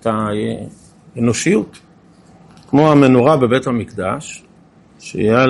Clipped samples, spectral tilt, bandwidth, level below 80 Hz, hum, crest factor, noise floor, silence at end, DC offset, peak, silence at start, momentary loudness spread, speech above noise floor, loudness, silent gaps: under 0.1%; -6 dB/octave; 11.5 kHz; -50 dBFS; none; 16 dB; -47 dBFS; 0 s; under 0.1%; 0 dBFS; 0.05 s; 22 LU; 33 dB; -15 LUFS; none